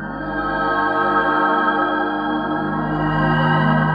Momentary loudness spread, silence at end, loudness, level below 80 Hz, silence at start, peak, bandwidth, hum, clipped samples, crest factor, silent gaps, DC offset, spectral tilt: 5 LU; 0 s; -18 LUFS; -40 dBFS; 0 s; -4 dBFS; 5.2 kHz; none; under 0.1%; 14 dB; none; under 0.1%; -8.5 dB/octave